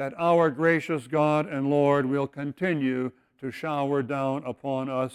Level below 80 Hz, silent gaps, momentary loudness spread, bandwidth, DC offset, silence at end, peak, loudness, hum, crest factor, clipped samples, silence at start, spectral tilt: -68 dBFS; none; 10 LU; 12.5 kHz; under 0.1%; 0 s; -10 dBFS; -26 LUFS; none; 16 dB; under 0.1%; 0 s; -7.5 dB/octave